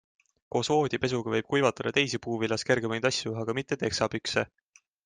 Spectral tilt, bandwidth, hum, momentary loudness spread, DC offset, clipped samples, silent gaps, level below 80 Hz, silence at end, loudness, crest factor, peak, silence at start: -4.5 dB/octave; 9.8 kHz; none; 5 LU; under 0.1%; under 0.1%; none; -62 dBFS; 0.6 s; -28 LUFS; 20 dB; -8 dBFS; 0.55 s